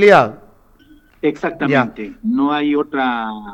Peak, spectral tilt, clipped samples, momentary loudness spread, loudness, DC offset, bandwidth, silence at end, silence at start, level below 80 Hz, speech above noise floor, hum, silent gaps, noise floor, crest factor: 0 dBFS; -6.5 dB/octave; under 0.1%; 9 LU; -17 LUFS; under 0.1%; 9.4 kHz; 0 s; 0 s; -52 dBFS; 33 dB; none; none; -48 dBFS; 16 dB